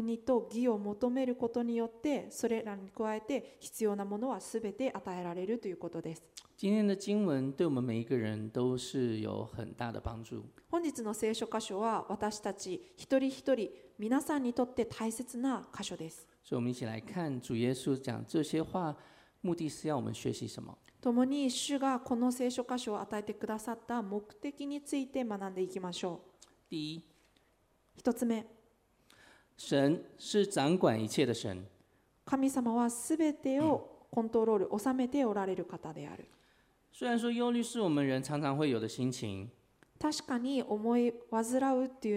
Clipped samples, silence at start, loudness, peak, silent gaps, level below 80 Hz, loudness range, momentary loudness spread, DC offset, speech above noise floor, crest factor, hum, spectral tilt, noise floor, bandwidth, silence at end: under 0.1%; 0 s; -35 LUFS; -14 dBFS; none; -68 dBFS; 6 LU; 11 LU; under 0.1%; 38 dB; 20 dB; none; -5.5 dB/octave; -72 dBFS; 16 kHz; 0 s